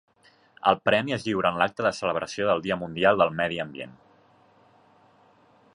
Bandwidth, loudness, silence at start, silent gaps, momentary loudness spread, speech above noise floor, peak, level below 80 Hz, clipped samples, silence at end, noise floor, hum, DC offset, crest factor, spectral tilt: 11 kHz; -25 LUFS; 0.65 s; none; 10 LU; 34 dB; -4 dBFS; -60 dBFS; under 0.1%; 1.85 s; -59 dBFS; none; under 0.1%; 22 dB; -5 dB/octave